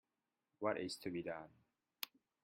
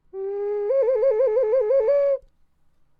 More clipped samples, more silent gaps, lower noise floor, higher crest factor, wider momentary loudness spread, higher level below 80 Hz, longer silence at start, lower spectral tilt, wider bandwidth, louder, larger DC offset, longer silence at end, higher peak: neither; neither; first, under -90 dBFS vs -59 dBFS; first, 26 dB vs 10 dB; about the same, 9 LU vs 9 LU; second, -84 dBFS vs -60 dBFS; first, 0.6 s vs 0.15 s; second, -4.5 dB/octave vs -6.5 dB/octave; first, 16 kHz vs 4.9 kHz; second, -45 LUFS vs -21 LUFS; neither; second, 0.35 s vs 0.8 s; second, -22 dBFS vs -12 dBFS